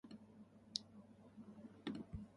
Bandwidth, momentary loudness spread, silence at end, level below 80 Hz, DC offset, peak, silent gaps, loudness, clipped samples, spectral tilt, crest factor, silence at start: 11 kHz; 15 LU; 0 s; -68 dBFS; under 0.1%; -20 dBFS; none; -52 LUFS; under 0.1%; -4 dB/octave; 34 dB; 0.05 s